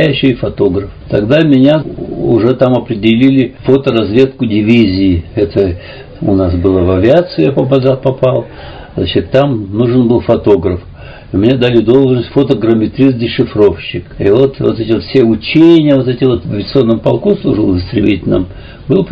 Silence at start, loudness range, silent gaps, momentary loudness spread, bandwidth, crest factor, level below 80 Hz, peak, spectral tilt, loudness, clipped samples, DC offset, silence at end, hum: 0 s; 2 LU; none; 8 LU; 6.8 kHz; 10 dB; -30 dBFS; 0 dBFS; -9 dB/octave; -11 LUFS; 1%; under 0.1%; 0 s; none